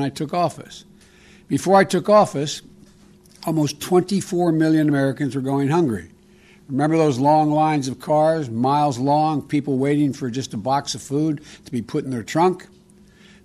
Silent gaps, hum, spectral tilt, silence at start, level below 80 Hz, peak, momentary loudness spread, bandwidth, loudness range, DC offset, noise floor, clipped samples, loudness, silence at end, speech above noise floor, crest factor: none; none; -6 dB/octave; 0 s; -58 dBFS; -4 dBFS; 11 LU; 13.5 kHz; 4 LU; under 0.1%; -50 dBFS; under 0.1%; -20 LUFS; 0.8 s; 31 dB; 16 dB